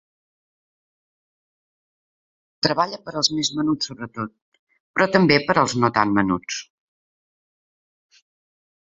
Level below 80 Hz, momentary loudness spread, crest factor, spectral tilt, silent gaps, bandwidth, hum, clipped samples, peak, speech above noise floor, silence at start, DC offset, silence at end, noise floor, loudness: -58 dBFS; 14 LU; 24 dB; -4 dB/octave; 4.42-4.52 s, 4.59-4.67 s, 4.80-4.94 s; 8 kHz; none; under 0.1%; -2 dBFS; over 69 dB; 2.65 s; under 0.1%; 2.35 s; under -90 dBFS; -21 LUFS